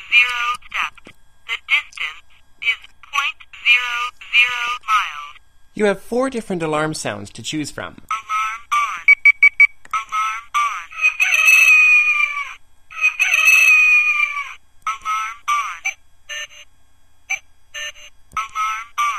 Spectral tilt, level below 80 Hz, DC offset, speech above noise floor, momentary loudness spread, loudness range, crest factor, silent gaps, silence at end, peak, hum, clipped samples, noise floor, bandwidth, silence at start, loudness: -1.5 dB/octave; -54 dBFS; 0.5%; 34 dB; 19 LU; 13 LU; 18 dB; none; 0 s; 0 dBFS; none; under 0.1%; -54 dBFS; 15 kHz; 0 s; -15 LUFS